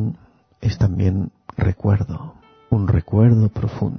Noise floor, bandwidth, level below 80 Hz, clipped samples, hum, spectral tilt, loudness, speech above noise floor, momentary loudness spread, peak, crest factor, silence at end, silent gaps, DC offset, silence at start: -47 dBFS; 6.4 kHz; -32 dBFS; under 0.1%; none; -9.5 dB/octave; -20 LUFS; 29 dB; 14 LU; -2 dBFS; 16 dB; 0 s; none; under 0.1%; 0 s